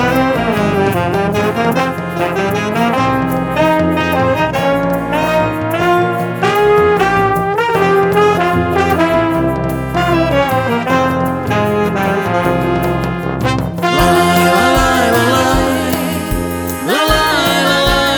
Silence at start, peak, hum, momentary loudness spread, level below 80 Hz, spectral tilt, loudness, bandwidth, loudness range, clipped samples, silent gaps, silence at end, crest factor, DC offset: 0 s; 0 dBFS; none; 6 LU; -30 dBFS; -5 dB/octave; -13 LUFS; over 20 kHz; 2 LU; under 0.1%; none; 0 s; 12 dB; under 0.1%